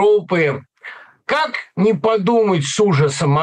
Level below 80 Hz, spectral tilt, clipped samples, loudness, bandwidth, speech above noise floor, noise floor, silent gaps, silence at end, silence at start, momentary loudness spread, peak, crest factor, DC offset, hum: -58 dBFS; -5.5 dB/octave; under 0.1%; -17 LUFS; 10 kHz; 22 dB; -38 dBFS; none; 0 s; 0 s; 17 LU; -6 dBFS; 10 dB; under 0.1%; none